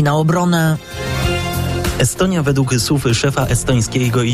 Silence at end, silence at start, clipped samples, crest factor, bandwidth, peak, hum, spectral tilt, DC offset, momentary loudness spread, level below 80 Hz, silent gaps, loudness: 0 s; 0 s; under 0.1%; 12 dB; 16 kHz; -4 dBFS; none; -5 dB/octave; under 0.1%; 5 LU; -32 dBFS; none; -16 LUFS